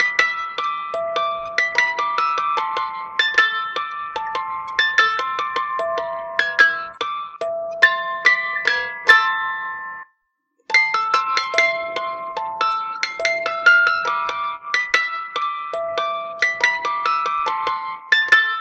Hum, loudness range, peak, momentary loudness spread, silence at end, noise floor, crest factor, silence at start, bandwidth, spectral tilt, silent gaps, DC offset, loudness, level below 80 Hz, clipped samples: none; 3 LU; 0 dBFS; 11 LU; 0 s; -69 dBFS; 20 dB; 0 s; 12.5 kHz; 0 dB/octave; none; under 0.1%; -19 LUFS; -66 dBFS; under 0.1%